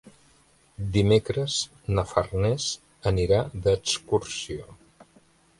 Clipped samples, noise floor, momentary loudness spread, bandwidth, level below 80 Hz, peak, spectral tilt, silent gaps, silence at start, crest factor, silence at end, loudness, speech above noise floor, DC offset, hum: under 0.1%; -60 dBFS; 11 LU; 11.5 kHz; -42 dBFS; -6 dBFS; -5 dB/octave; none; 0.05 s; 22 dB; 0.85 s; -26 LUFS; 35 dB; under 0.1%; none